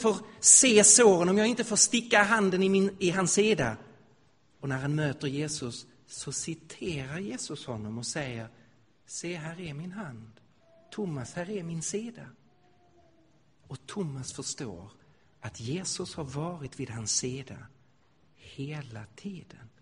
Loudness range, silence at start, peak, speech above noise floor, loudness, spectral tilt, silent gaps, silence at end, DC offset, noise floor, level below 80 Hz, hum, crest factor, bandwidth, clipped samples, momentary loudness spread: 16 LU; 0 s; -4 dBFS; 38 dB; -26 LUFS; -3 dB/octave; none; 0.15 s; under 0.1%; -66 dBFS; -62 dBFS; none; 24 dB; 10.5 kHz; under 0.1%; 22 LU